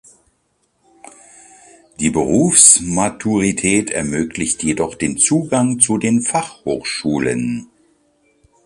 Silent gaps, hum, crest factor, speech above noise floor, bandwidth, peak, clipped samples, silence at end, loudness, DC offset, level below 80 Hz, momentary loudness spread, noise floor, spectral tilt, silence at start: none; none; 18 dB; 48 dB; 14.5 kHz; 0 dBFS; under 0.1%; 1 s; -15 LUFS; under 0.1%; -46 dBFS; 13 LU; -64 dBFS; -3.5 dB/octave; 2 s